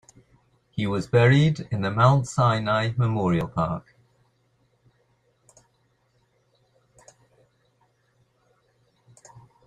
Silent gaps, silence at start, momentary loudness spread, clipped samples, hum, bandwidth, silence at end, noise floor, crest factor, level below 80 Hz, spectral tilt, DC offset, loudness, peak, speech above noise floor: none; 0.75 s; 10 LU; under 0.1%; none; 10 kHz; 5.85 s; -67 dBFS; 20 dB; -56 dBFS; -7 dB/octave; under 0.1%; -22 LUFS; -6 dBFS; 46 dB